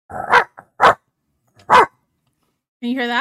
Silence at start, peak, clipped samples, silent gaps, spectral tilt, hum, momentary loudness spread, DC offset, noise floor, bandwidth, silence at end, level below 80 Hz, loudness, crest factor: 0.1 s; -2 dBFS; under 0.1%; 2.68-2.80 s; -3.5 dB/octave; none; 13 LU; under 0.1%; -68 dBFS; 14 kHz; 0 s; -54 dBFS; -16 LUFS; 18 dB